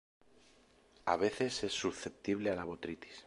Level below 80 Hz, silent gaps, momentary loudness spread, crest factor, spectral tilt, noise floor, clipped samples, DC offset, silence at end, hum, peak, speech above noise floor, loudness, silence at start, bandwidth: -66 dBFS; none; 9 LU; 24 dB; -4 dB/octave; -66 dBFS; under 0.1%; under 0.1%; 0 s; none; -16 dBFS; 29 dB; -37 LUFS; 1.05 s; 11.5 kHz